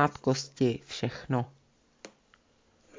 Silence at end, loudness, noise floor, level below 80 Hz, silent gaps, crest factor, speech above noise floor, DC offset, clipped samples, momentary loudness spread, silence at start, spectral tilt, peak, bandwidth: 0.9 s; -31 LUFS; -66 dBFS; -64 dBFS; none; 22 dB; 36 dB; under 0.1%; under 0.1%; 24 LU; 0 s; -5.5 dB/octave; -10 dBFS; 7.6 kHz